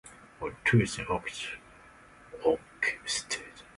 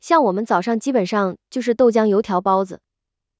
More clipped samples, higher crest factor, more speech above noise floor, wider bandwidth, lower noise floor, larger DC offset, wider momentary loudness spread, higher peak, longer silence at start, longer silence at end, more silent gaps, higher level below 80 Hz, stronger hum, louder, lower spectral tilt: neither; about the same, 20 dB vs 16 dB; second, 24 dB vs 64 dB; first, 11.5 kHz vs 8 kHz; second, -55 dBFS vs -82 dBFS; neither; first, 15 LU vs 8 LU; second, -12 dBFS vs -4 dBFS; about the same, 0.05 s vs 0.05 s; second, 0.15 s vs 0.65 s; neither; first, -56 dBFS vs -62 dBFS; neither; second, -31 LUFS vs -19 LUFS; second, -4.5 dB/octave vs -6 dB/octave